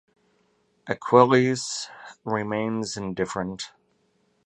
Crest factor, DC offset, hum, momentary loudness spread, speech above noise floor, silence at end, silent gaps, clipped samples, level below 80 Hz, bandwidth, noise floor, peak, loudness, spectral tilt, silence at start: 24 dB; under 0.1%; none; 19 LU; 44 dB; 0.8 s; none; under 0.1%; -62 dBFS; 11.5 kHz; -68 dBFS; -2 dBFS; -24 LUFS; -5 dB/octave; 0.85 s